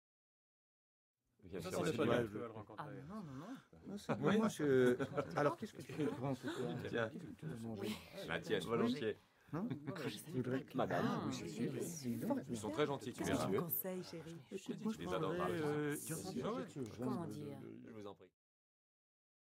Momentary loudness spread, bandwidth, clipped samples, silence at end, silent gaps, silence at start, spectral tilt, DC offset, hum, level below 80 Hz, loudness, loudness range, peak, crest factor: 14 LU; 16 kHz; under 0.1%; 1.3 s; none; 1.45 s; -5.5 dB/octave; under 0.1%; none; -76 dBFS; -41 LUFS; 5 LU; -20 dBFS; 22 dB